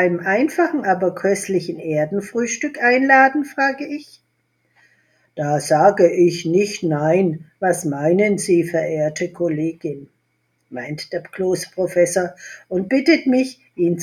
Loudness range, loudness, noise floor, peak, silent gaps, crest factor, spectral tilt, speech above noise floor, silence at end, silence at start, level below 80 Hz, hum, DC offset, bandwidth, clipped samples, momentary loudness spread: 6 LU; -18 LUFS; -67 dBFS; 0 dBFS; none; 18 dB; -5.5 dB/octave; 49 dB; 0 s; 0 s; -64 dBFS; none; under 0.1%; 14 kHz; under 0.1%; 13 LU